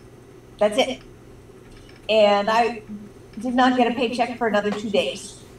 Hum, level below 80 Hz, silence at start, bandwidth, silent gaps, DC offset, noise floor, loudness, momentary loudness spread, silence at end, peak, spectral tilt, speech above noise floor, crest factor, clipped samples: none; -54 dBFS; 0.05 s; 12.5 kHz; none; under 0.1%; -45 dBFS; -21 LUFS; 18 LU; 0 s; -6 dBFS; -4.5 dB/octave; 25 dB; 18 dB; under 0.1%